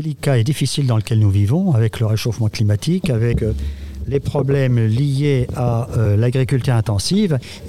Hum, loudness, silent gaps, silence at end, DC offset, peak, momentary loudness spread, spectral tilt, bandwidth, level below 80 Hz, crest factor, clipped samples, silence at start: none; -18 LUFS; none; 0 s; 0.7%; -4 dBFS; 4 LU; -6.5 dB/octave; 14 kHz; -36 dBFS; 12 dB; under 0.1%; 0 s